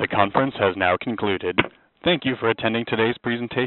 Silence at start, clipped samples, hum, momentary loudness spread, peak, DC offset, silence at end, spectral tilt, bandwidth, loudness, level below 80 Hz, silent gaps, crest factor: 0 s; under 0.1%; none; 5 LU; -2 dBFS; under 0.1%; 0 s; -3 dB/octave; 4.2 kHz; -22 LUFS; -56 dBFS; none; 20 dB